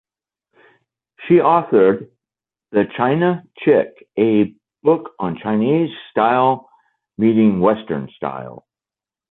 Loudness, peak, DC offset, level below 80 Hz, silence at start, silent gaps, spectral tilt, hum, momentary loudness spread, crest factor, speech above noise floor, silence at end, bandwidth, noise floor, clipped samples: -17 LUFS; -2 dBFS; under 0.1%; -58 dBFS; 1.2 s; none; -11 dB/octave; none; 12 LU; 16 dB; over 74 dB; 0.75 s; 4.1 kHz; under -90 dBFS; under 0.1%